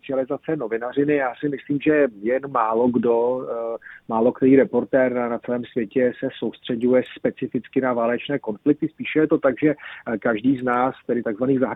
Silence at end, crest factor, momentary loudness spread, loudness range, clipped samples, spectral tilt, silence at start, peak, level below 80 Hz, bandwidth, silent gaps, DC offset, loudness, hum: 0 s; 18 dB; 8 LU; 3 LU; under 0.1%; -9.5 dB/octave; 0.05 s; -4 dBFS; -62 dBFS; 4 kHz; none; under 0.1%; -22 LUFS; none